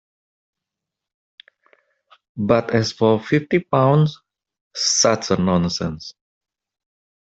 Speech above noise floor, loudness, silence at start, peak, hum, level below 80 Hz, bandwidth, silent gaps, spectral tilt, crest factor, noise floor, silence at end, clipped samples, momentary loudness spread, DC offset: 67 dB; -19 LUFS; 2.35 s; -2 dBFS; none; -56 dBFS; 8.2 kHz; 4.61-4.71 s; -4.5 dB/octave; 18 dB; -85 dBFS; 1.25 s; under 0.1%; 14 LU; under 0.1%